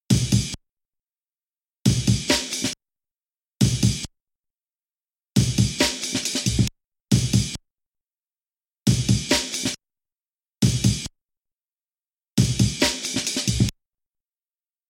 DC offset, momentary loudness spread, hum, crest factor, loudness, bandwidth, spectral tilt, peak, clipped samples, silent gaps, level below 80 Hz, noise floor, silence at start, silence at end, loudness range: under 0.1%; 9 LU; none; 20 dB; -22 LUFS; 16.5 kHz; -4 dB/octave; -4 dBFS; under 0.1%; none; -38 dBFS; under -90 dBFS; 0.1 s; 1.2 s; 3 LU